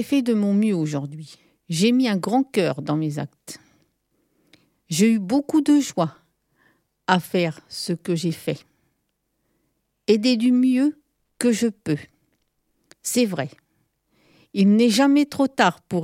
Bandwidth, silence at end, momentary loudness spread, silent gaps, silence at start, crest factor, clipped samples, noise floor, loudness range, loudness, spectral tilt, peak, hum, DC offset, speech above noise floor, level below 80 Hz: 16.5 kHz; 0 s; 14 LU; none; 0 s; 22 dB; under 0.1%; -74 dBFS; 5 LU; -21 LUFS; -5.5 dB/octave; -2 dBFS; none; under 0.1%; 53 dB; -70 dBFS